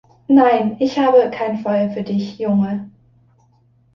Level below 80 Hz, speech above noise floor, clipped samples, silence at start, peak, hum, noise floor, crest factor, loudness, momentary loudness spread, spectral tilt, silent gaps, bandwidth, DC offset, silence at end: -60 dBFS; 40 dB; under 0.1%; 0.3 s; -2 dBFS; none; -56 dBFS; 16 dB; -17 LUFS; 10 LU; -8 dB/octave; none; 6.8 kHz; under 0.1%; 1.05 s